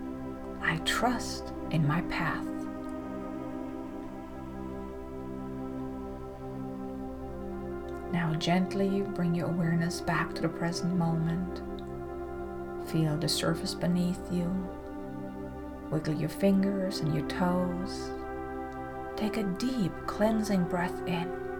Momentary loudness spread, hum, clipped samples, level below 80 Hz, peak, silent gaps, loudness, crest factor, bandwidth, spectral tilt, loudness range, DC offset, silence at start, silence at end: 12 LU; none; under 0.1%; -48 dBFS; -14 dBFS; none; -32 LUFS; 18 dB; 19 kHz; -6 dB/octave; 9 LU; under 0.1%; 0 s; 0 s